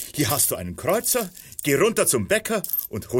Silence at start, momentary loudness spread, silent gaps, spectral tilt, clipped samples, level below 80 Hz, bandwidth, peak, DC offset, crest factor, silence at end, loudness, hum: 0 s; 7 LU; none; -3.5 dB/octave; under 0.1%; -52 dBFS; 17 kHz; -6 dBFS; under 0.1%; 16 dB; 0 s; -22 LUFS; none